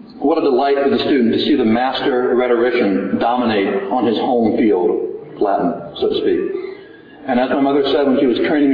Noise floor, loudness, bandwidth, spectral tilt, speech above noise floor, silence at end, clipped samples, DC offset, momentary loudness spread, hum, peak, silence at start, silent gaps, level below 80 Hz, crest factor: -38 dBFS; -16 LUFS; 5.2 kHz; -8 dB/octave; 23 dB; 0 s; under 0.1%; under 0.1%; 7 LU; none; -4 dBFS; 0 s; none; -52 dBFS; 12 dB